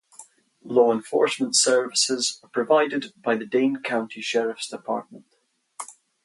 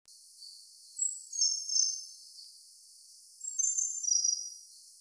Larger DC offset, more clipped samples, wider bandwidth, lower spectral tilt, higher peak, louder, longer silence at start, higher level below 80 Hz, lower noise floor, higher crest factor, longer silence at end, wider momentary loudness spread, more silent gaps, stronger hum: neither; neither; about the same, 11.5 kHz vs 11 kHz; first, -2 dB/octave vs 9.5 dB/octave; first, -6 dBFS vs -14 dBFS; first, -23 LUFS vs -30 LUFS; about the same, 0.2 s vs 0.1 s; first, -78 dBFS vs under -90 dBFS; first, -70 dBFS vs -56 dBFS; about the same, 18 dB vs 20 dB; first, 0.35 s vs 0.05 s; second, 12 LU vs 22 LU; neither; neither